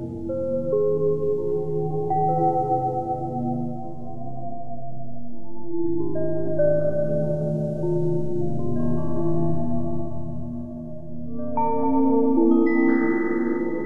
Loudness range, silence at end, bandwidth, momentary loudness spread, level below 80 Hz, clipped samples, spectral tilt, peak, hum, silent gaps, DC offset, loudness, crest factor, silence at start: 7 LU; 0 s; 3.4 kHz; 16 LU; -48 dBFS; under 0.1%; -11 dB/octave; -8 dBFS; none; none; under 0.1%; -24 LUFS; 14 dB; 0 s